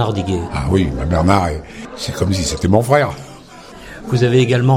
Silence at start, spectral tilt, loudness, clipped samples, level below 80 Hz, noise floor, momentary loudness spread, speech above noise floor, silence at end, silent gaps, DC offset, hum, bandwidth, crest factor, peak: 0 s; -6 dB/octave; -16 LUFS; under 0.1%; -34 dBFS; -37 dBFS; 21 LU; 22 dB; 0 s; none; under 0.1%; none; 16 kHz; 16 dB; 0 dBFS